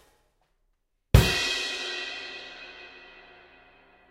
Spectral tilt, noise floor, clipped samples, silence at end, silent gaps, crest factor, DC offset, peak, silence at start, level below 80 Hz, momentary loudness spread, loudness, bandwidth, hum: -4.5 dB/octave; -73 dBFS; under 0.1%; 1.05 s; none; 28 dB; under 0.1%; -2 dBFS; 1.15 s; -34 dBFS; 24 LU; -25 LUFS; 16 kHz; none